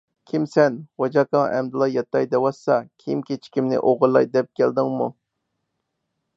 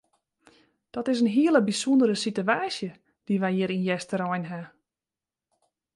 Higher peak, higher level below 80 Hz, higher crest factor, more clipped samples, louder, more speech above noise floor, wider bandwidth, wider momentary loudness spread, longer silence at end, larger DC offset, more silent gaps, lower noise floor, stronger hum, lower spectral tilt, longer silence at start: first, -2 dBFS vs -8 dBFS; about the same, -72 dBFS vs -74 dBFS; about the same, 18 dB vs 18 dB; neither; first, -21 LUFS vs -25 LUFS; second, 57 dB vs over 65 dB; second, 7.8 kHz vs 11.5 kHz; second, 9 LU vs 13 LU; about the same, 1.25 s vs 1.3 s; neither; neither; second, -77 dBFS vs under -90 dBFS; neither; first, -7.5 dB/octave vs -5.5 dB/octave; second, 0.35 s vs 0.95 s